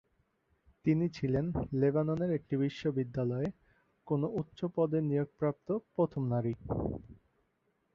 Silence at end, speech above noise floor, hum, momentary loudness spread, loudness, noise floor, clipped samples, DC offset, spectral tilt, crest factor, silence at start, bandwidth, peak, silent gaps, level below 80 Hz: 0.8 s; 45 dB; none; 6 LU; -34 LUFS; -77 dBFS; under 0.1%; under 0.1%; -9.5 dB/octave; 16 dB; 0.85 s; 7 kHz; -16 dBFS; none; -56 dBFS